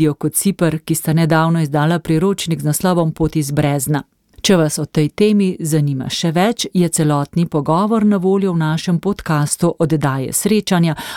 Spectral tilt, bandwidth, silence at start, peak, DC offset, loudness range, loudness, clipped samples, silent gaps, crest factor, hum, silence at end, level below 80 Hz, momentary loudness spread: -5.5 dB/octave; 17.5 kHz; 0 s; -2 dBFS; under 0.1%; 1 LU; -16 LUFS; under 0.1%; none; 14 dB; none; 0 s; -44 dBFS; 4 LU